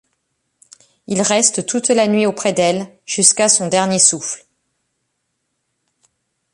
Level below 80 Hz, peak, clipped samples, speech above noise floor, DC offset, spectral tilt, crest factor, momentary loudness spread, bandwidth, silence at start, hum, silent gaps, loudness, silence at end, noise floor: -62 dBFS; 0 dBFS; under 0.1%; 56 dB; under 0.1%; -2.5 dB/octave; 18 dB; 12 LU; 12.5 kHz; 1.1 s; none; none; -14 LUFS; 2.15 s; -72 dBFS